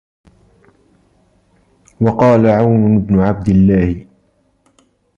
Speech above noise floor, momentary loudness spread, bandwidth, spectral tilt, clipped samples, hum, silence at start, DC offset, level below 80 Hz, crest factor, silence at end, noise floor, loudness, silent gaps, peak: 47 dB; 7 LU; 7.2 kHz; -10 dB/octave; under 0.1%; none; 2 s; under 0.1%; -36 dBFS; 14 dB; 1.15 s; -58 dBFS; -12 LUFS; none; -2 dBFS